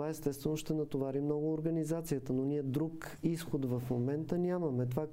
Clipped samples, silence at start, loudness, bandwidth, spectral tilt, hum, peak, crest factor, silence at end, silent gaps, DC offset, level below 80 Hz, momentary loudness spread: under 0.1%; 0 s; -36 LUFS; 16 kHz; -7.5 dB/octave; none; -20 dBFS; 16 dB; 0 s; none; under 0.1%; -60 dBFS; 3 LU